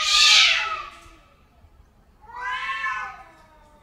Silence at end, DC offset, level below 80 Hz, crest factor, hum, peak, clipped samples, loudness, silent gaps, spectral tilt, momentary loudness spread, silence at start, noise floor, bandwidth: 0.6 s; under 0.1%; -54 dBFS; 20 dB; none; -4 dBFS; under 0.1%; -18 LUFS; none; 3 dB/octave; 22 LU; 0 s; -54 dBFS; 16 kHz